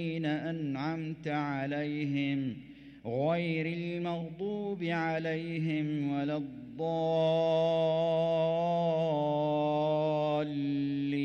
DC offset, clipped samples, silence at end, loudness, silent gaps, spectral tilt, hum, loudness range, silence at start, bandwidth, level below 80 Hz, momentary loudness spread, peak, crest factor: under 0.1%; under 0.1%; 0 s; -32 LUFS; none; -8 dB/octave; none; 5 LU; 0 s; 7 kHz; -68 dBFS; 8 LU; -18 dBFS; 12 dB